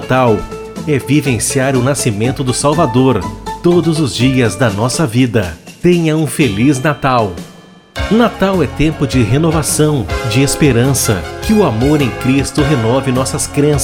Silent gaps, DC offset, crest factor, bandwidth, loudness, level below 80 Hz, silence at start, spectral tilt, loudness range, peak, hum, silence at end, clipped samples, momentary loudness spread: none; under 0.1%; 12 dB; 17.5 kHz; -13 LUFS; -30 dBFS; 0 s; -5.5 dB/octave; 1 LU; 0 dBFS; none; 0 s; under 0.1%; 6 LU